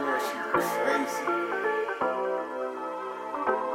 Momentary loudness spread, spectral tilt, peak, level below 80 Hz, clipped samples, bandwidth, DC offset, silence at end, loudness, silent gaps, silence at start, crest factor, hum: 8 LU; -3.5 dB/octave; -10 dBFS; -70 dBFS; under 0.1%; 16.5 kHz; under 0.1%; 0 s; -29 LUFS; none; 0 s; 18 dB; none